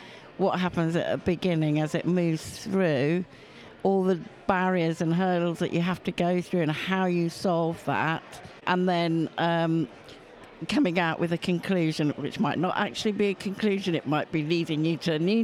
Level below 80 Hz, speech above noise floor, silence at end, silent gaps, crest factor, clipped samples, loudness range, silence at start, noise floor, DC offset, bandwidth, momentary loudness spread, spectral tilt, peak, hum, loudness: -62 dBFS; 22 dB; 0 s; none; 20 dB; under 0.1%; 1 LU; 0 s; -48 dBFS; under 0.1%; 13 kHz; 5 LU; -6.5 dB/octave; -6 dBFS; none; -27 LUFS